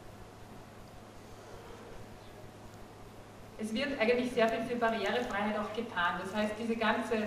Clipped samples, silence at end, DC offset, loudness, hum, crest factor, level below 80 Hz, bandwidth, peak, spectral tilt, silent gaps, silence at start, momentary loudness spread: under 0.1%; 0 s; under 0.1%; -33 LUFS; none; 20 dB; -58 dBFS; 15.5 kHz; -16 dBFS; -5 dB/octave; none; 0 s; 21 LU